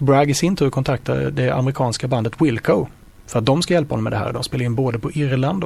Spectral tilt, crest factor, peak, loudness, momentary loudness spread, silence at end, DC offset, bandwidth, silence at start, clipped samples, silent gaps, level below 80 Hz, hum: -6 dB/octave; 16 dB; -2 dBFS; -20 LUFS; 6 LU; 0 s; under 0.1%; 13.5 kHz; 0 s; under 0.1%; none; -44 dBFS; none